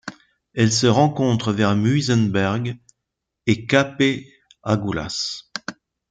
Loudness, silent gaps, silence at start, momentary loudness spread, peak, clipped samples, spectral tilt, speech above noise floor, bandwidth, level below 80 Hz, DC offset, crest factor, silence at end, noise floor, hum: -20 LUFS; none; 0.05 s; 15 LU; -2 dBFS; under 0.1%; -5 dB/octave; 62 dB; 9.2 kHz; -54 dBFS; under 0.1%; 18 dB; 0.4 s; -81 dBFS; none